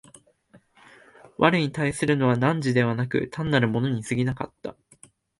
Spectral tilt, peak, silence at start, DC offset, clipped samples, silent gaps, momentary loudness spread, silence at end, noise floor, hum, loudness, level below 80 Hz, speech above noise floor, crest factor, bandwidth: -6.5 dB/octave; -4 dBFS; 0.55 s; under 0.1%; under 0.1%; none; 13 LU; 0.65 s; -58 dBFS; none; -24 LUFS; -56 dBFS; 34 dB; 22 dB; 11.5 kHz